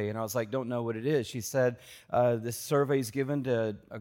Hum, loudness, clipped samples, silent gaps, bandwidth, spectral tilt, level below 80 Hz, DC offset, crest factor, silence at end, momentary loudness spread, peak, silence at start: none; -30 LUFS; under 0.1%; none; 17 kHz; -6 dB/octave; -68 dBFS; under 0.1%; 16 dB; 0 s; 6 LU; -14 dBFS; 0 s